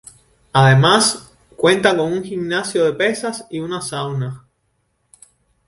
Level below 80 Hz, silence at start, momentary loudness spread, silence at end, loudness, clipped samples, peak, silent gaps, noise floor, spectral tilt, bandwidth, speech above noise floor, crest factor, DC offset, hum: -52 dBFS; 0.55 s; 14 LU; 1.3 s; -17 LUFS; under 0.1%; 0 dBFS; none; -67 dBFS; -4.5 dB/octave; 11.5 kHz; 51 dB; 18 dB; under 0.1%; none